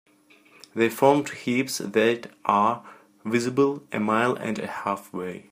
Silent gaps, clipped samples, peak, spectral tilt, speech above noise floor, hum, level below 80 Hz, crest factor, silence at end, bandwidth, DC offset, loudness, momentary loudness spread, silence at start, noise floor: none; under 0.1%; -4 dBFS; -5 dB/octave; 32 dB; none; -72 dBFS; 22 dB; 0.1 s; 15.5 kHz; under 0.1%; -24 LUFS; 12 LU; 0.75 s; -56 dBFS